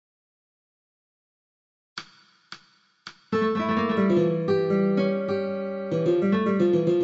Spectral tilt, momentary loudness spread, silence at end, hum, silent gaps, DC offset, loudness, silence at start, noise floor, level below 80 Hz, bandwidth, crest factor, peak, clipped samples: -8 dB/octave; 23 LU; 0 s; none; none; under 0.1%; -24 LUFS; 2 s; -60 dBFS; -70 dBFS; 7.6 kHz; 14 dB; -10 dBFS; under 0.1%